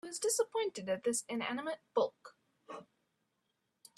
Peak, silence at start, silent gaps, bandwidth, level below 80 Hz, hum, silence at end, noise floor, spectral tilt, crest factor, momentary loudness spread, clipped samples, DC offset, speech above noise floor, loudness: -20 dBFS; 0.05 s; none; 14 kHz; -84 dBFS; none; 1.15 s; -83 dBFS; -2.5 dB/octave; 20 dB; 18 LU; under 0.1%; under 0.1%; 47 dB; -36 LUFS